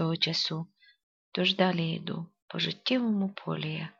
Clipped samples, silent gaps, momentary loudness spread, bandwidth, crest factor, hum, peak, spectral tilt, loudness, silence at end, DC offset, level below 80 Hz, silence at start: under 0.1%; 1.03-1.32 s, 2.42-2.48 s; 12 LU; 7.4 kHz; 20 dB; none; -12 dBFS; -5.5 dB/octave; -30 LUFS; 0.1 s; under 0.1%; -76 dBFS; 0 s